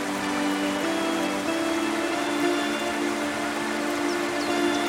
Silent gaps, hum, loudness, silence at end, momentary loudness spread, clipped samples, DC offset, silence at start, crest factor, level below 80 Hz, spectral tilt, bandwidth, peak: none; none; -26 LUFS; 0 s; 3 LU; under 0.1%; under 0.1%; 0 s; 14 dB; -60 dBFS; -3 dB/octave; 16.5 kHz; -12 dBFS